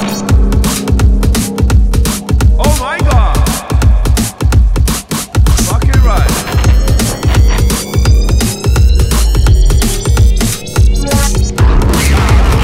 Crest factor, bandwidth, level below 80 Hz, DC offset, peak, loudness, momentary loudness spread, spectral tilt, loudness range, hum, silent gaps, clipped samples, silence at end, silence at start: 8 dB; 16.5 kHz; -10 dBFS; under 0.1%; 0 dBFS; -11 LUFS; 3 LU; -5 dB/octave; 1 LU; none; none; under 0.1%; 0 s; 0 s